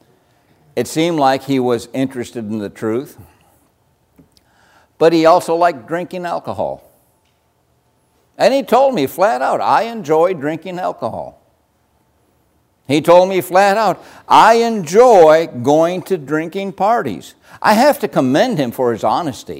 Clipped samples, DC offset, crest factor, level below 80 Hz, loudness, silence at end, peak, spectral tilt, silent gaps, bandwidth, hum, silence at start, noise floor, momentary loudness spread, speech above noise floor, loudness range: under 0.1%; under 0.1%; 16 dB; -58 dBFS; -14 LUFS; 0 s; 0 dBFS; -5 dB/octave; none; 16 kHz; none; 0.75 s; -60 dBFS; 14 LU; 46 dB; 9 LU